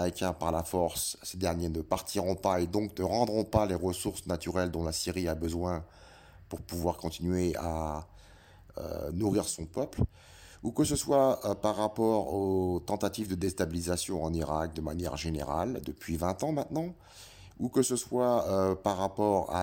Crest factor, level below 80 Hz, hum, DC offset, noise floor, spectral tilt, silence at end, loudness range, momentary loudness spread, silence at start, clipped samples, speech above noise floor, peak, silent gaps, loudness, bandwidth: 20 dB; -48 dBFS; none; under 0.1%; -55 dBFS; -5.5 dB/octave; 0 s; 5 LU; 9 LU; 0 s; under 0.1%; 24 dB; -10 dBFS; none; -32 LUFS; 17 kHz